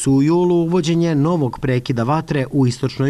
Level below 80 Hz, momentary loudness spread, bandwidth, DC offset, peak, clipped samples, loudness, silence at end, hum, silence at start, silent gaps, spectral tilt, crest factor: -44 dBFS; 5 LU; 12.5 kHz; under 0.1%; -8 dBFS; under 0.1%; -17 LUFS; 0 s; none; 0 s; none; -7 dB/octave; 8 dB